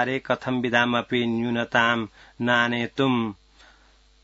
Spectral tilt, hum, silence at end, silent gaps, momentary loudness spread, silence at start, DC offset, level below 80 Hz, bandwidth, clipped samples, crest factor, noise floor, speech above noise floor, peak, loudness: -5.5 dB/octave; none; 0.9 s; none; 6 LU; 0 s; under 0.1%; -60 dBFS; 7.8 kHz; under 0.1%; 20 dB; -57 dBFS; 33 dB; -4 dBFS; -23 LUFS